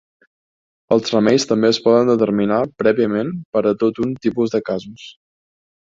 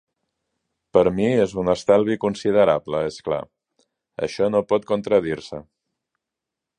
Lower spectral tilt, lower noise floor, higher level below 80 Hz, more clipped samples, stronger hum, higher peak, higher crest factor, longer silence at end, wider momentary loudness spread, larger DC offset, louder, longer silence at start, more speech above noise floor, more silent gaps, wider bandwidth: about the same, -5.5 dB/octave vs -6.5 dB/octave; first, under -90 dBFS vs -85 dBFS; about the same, -58 dBFS vs -54 dBFS; neither; neither; about the same, -2 dBFS vs -2 dBFS; about the same, 16 dB vs 20 dB; second, 0.85 s vs 1.2 s; second, 8 LU vs 11 LU; neither; first, -17 LUFS vs -21 LUFS; about the same, 0.9 s vs 0.95 s; first, over 73 dB vs 65 dB; first, 3.45-3.53 s vs none; second, 7.8 kHz vs 9.8 kHz